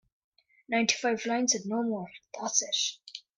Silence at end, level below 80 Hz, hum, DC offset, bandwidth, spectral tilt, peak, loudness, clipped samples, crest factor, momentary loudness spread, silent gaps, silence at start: 0.2 s; -78 dBFS; none; under 0.1%; 10 kHz; -1.5 dB/octave; -8 dBFS; -29 LUFS; under 0.1%; 22 dB; 11 LU; none; 0.7 s